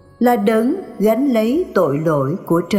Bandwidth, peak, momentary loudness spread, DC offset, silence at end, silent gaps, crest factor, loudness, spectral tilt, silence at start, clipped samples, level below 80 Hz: 17 kHz; -4 dBFS; 4 LU; under 0.1%; 0 s; none; 14 dB; -17 LUFS; -7.5 dB/octave; 0.2 s; under 0.1%; -54 dBFS